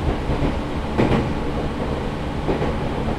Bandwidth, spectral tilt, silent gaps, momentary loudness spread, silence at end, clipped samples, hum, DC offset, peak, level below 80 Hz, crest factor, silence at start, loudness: 12.5 kHz; -7.5 dB/octave; none; 6 LU; 0 s; under 0.1%; none; under 0.1%; -4 dBFS; -28 dBFS; 18 dB; 0 s; -23 LUFS